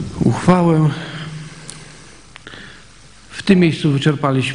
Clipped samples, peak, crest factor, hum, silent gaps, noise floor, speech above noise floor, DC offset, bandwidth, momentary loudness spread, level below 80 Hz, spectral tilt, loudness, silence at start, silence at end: under 0.1%; 0 dBFS; 18 dB; none; none; -44 dBFS; 30 dB; 0.4%; 10.5 kHz; 22 LU; -44 dBFS; -6.5 dB/octave; -15 LUFS; 0 s; 0 s